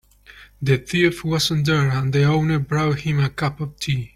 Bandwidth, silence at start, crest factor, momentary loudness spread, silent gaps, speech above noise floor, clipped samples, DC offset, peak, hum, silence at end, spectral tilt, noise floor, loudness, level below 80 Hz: 15.5 kHz; 0.35 s; 16 dB; 7 LU; none; 27 dB; under 0.1%; under 0.1%; -4 dBFS; none; 0.1 s; -6 dB/octave; -47 dBFS; -20 LUFS; -46 dBFS